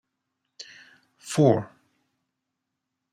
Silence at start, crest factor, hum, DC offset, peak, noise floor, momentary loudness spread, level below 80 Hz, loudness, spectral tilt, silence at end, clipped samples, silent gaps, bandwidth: 1.25 s; 22 dB; none; under 0.1%; -6 dBFS; -83 dBFS; 24 LU; -72 dBFS; -23 LUFS; -6.5 dB/octave; 1.45 s; under 0.1%; none; 15 kHz